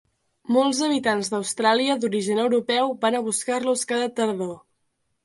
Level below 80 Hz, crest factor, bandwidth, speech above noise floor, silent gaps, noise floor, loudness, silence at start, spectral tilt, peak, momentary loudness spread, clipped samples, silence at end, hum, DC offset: -70 dBFS; 18 dB; 11.5 kHz; 50 dB; none; -73 dBFS; -23 LUFS; 0.5 s; -3 dB/octave; -6 dBFS; 6 LU; under 0.1%; 0.65 s; none; under 0.1%